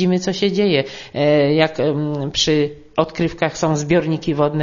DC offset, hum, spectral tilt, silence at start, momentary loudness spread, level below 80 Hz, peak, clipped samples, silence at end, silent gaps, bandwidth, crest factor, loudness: under 0.1%; none; -5.5 dB/octave; 0 s; 6 LU; -46 dBFS; 0 dBFS; under 0.1%; 0 s; none; 7.4 kHz; 18 dB; -18 LUFS